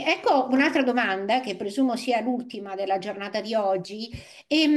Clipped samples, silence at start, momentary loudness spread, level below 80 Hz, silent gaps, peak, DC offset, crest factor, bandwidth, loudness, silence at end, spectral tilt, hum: under 0.1%; 0 s; 12 LU; -62 dBFS; none; -8 dBFS; under 0.1%; 16 dB; 12.5 kHz; -25 LUFS; 0 s; -4.5 dB/octave; none